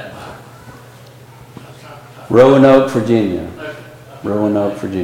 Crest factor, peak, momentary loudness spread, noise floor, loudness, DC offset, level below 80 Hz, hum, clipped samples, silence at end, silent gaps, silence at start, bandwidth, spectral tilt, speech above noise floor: 16 dB; 0 dBFS; 27 LU; -39 dBFS; -12 LUFS; under 0.1%; -48 dBFS; none; under 0.1%; 0 s; none; 0 s; 16 kHz; -7.5 dB/octave; 27 dB